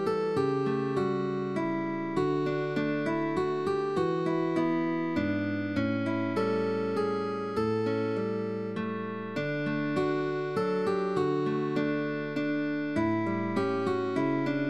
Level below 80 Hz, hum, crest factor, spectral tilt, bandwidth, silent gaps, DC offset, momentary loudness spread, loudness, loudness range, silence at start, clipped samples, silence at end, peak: -64 dBFS; none; 14 dB; -7.5 dB/octave; 11 kHz; none; 0.2%; 3 LU; -30 LUFS; 2 LU; 0 s; under 0.1%; 0 s; -16 dBFS